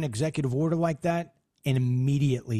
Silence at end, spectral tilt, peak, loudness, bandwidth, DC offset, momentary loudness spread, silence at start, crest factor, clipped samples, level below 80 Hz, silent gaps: 0 s; -7.5 dB/octave; -12 dBFS; -27 LUFS; 13 kHz; under 0.1%; 7 LU; 0 s; 14 dB; under 0.1%; -56 dBFS; none